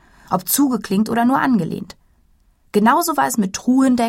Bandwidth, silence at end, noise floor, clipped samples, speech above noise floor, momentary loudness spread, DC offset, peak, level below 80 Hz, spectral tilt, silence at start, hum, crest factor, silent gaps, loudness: 16.5 kHz; 0 s; -56 dBFS; under 0.1%; 40 dB; 9 LU; under 0.1%; -2 dBFS; -54 dBFS; -4.5 dB/octave; 0.3 s; none; 16 dB; none; -17 LUFS